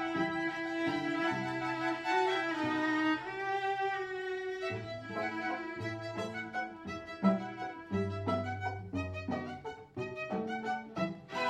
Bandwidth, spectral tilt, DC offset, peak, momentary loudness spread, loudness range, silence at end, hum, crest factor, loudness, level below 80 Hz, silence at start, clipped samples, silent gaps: 10.5 kHz; -6 dB/octave; under 0.1%; -16 dBFS; 9 LU; 5 LU; 0 s; none; 20 dB; -35 LUFS; -68 dBFS; 0 s; under 0.1%; none